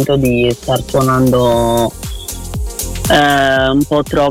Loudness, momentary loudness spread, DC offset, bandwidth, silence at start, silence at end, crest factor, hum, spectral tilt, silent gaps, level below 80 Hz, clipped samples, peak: -13 LUFS; 12 LU; under 0.1%; 17 kHz; 0 s; 0 s; 12 dB; none; -5 dB/octave; none; -28 dBFS; under 0.1%; 0 dBFS